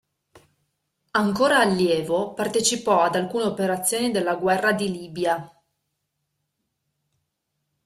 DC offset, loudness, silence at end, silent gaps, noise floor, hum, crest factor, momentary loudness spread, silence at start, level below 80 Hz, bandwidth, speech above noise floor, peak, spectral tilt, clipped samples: under 0.1%; -22 LUFS; 2.4 s; none; -78 dBFS; none; 18 dB; 7 LU; 0.35 s; -64 dBFS; 15.5 kHz; 56 dB; -6 dBFS; -3.5 dB/octave; under 0.1%